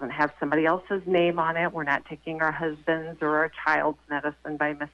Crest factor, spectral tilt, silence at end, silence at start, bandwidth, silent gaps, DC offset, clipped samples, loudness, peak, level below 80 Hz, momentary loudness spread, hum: 16 dB; -7 dB/octave; 0.05 s; 0 s; 7.4 kHz; none; under 0.1%; under 0.1%; -26 LUFS; -10 dBFS; -60 dBFS; 6 LU; none